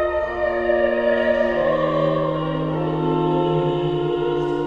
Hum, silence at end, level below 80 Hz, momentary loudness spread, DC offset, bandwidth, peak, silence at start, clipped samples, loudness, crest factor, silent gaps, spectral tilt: none; 0 s; -44 dBFS; 4 LU; 0.1%; 7 kHz; -8 dBFS; 0 s; under 0.1%; -20 LUFS; 12 dB; none; -8.5 dB/octave